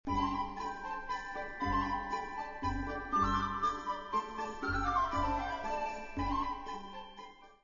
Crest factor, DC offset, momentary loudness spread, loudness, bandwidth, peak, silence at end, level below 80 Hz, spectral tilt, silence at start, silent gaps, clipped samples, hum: 16 dB; under 0.1%; 10 LU; -36 LUFS; 7.2 kHz; -20 dBFS; 0.1 s; -48 dBFS; -4 dB/octave; 0.05 s; none; under 0.1%; none